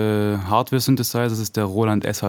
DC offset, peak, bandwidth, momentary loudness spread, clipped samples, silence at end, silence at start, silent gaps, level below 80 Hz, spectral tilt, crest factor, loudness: under 0.1%; -4 dBFS; 19.5 kHz; 4 LU; under 0.1%; 0 s; 0 s; none; -56 dBFS; -5.5 dB/octave; 16 dB; -21 LUFS